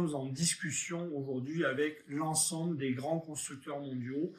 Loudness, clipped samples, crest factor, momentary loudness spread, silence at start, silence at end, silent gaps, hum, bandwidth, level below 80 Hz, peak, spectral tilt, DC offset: -35 LUFS; under 0.1%; 18 dB; 9 LU; 0 s; 0 s; none; none; 15 kHz; -76 dBFS; -18 dBFS; -4 dB/octave; under 0.1%